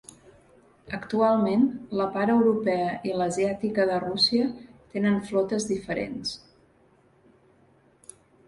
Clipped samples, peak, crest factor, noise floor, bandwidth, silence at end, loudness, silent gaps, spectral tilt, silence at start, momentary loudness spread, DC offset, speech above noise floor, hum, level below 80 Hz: under 0.1%; -10 dBFS; 18 dB; -61 dBFS; 11.5 kHz; 2.1 s; -25 LUFS; none; -5 dB/octave; 0.85 s; 12 LU; under 0.1%; 36 dB; none; -60 dBFS